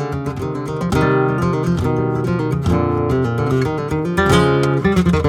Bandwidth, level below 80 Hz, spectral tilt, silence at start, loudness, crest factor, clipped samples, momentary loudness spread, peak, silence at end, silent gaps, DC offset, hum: 15.5 kHz; -34 dBFS; -7 dB/octave; 0 s; -17 LUFS; 16 dB; under 0.1%; 8 LU; -2 dBFS; 0 s; none; under 0.1%; none